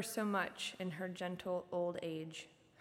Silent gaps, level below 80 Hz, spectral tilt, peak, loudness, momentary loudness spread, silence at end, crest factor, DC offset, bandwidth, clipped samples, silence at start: none; -80 dBFS; -4.5 dB/octave; -24 dBFS; -41 LUFS; 10 LU; 0.3 s; 18 dB; under 0.1%; 17.5 kHz; under 0.1%; 0 s